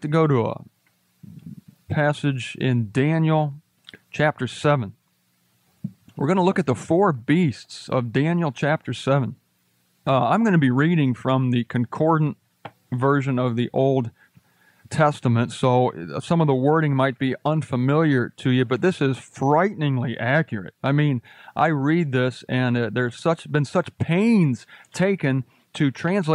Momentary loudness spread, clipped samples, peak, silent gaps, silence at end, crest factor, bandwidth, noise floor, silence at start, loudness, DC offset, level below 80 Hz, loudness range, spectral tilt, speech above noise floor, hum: 10 LU; under 0.1%; -6 dBFS; none; 0 s; 16 dB; 11 kHz; -66 dBFS; 0 s; -22 LUFS; under 0.1%; -64 dBFS; 3 LU; -7.5 dB/octave; 45 dB; none